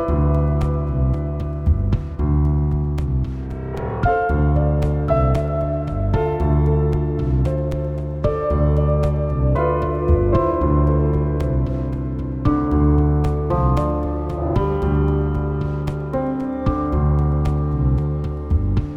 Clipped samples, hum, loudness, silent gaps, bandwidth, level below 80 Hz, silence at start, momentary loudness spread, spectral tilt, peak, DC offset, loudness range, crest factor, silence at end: under 0.1%; none; -20 LUFS; none; 5.2 kHz; -22 dBFS; 0 s; 6 LU; -10.5 dB/octave; -4 dBFS; 0.2%; 2 LU; 14 dB; 0 s